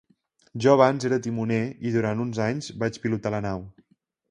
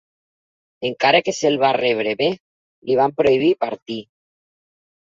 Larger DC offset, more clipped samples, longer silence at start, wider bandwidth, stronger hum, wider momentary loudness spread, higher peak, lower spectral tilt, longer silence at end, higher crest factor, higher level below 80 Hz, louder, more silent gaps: neither; neither; second, 0.55 s vs 0.8 s; first, 11 kHz vs 7.8 kHz; neither; second, 11 LU vs 15 LU; about the same, -4 dBFS vs -2 dBFS; first, -6.5 dB/octave vs -4.5 dB/octave; second, 0.6 s vs 1.1 s; about the same, 22 dB vs 18 dB; about the same, -56 dBFS vs -60 dBFS; second, -25 LUFS vs -18 LUFS; second, none vs 2.40-2.82 s, 3.82-3.86 s